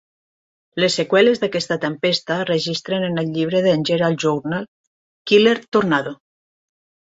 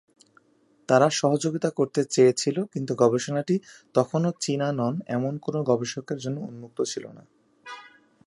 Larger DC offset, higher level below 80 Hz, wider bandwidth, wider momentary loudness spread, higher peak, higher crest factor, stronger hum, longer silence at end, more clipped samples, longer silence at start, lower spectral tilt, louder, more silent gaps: neither; first, -62 dBFS vs -72 dBFS; second, 8 kHz vs 11.5 kHz; second, 10 LU vs 16 LU; about the same, -2 dBFS vs -4 dBFS; about the same, 18 dB vs 22 dB; neither; first, 0.9 s vs 0.45 s; neither; second, 0.75 s vs 0.9 s; about the same, -5 dB/octave vs -5.5 dB/octave; first, -19 LUFS vs -25 LUFS; first, 4.68-5.25 s vs none